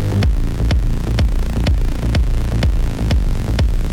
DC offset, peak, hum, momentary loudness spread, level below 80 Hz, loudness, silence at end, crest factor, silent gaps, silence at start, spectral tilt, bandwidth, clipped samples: under 0.1%; -8 dBFS; none; 2 LU; -16 dBFS; -19 LUFS; 0 s; 8 dB; none; 0 s; -6.5 dB/octave; 15 kHz; under 0.1%